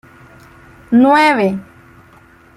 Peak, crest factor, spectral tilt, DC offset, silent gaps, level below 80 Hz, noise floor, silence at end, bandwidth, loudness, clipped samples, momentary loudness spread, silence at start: -2 dBFS; 14 dB; -6 dB/octave; under 0.1%; none; -54 dBFS; -45 dBFS; 0.95 s; 12.5 kHz; -12 LUFS; under 0.1%; 10 LU; 0.9 s